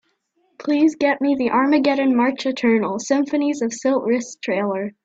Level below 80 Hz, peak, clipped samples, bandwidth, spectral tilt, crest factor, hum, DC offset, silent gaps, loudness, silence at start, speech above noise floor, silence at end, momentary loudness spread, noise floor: -64 dBFS; -6 dBFS; under 0.1%; 8 kHz; -4.5 dB/octave; 14 dB; none; under 0.1%; none; -19 LUFS; 0.6 s; 47 dB; 0.15 s; 6 LU; -66 dBFS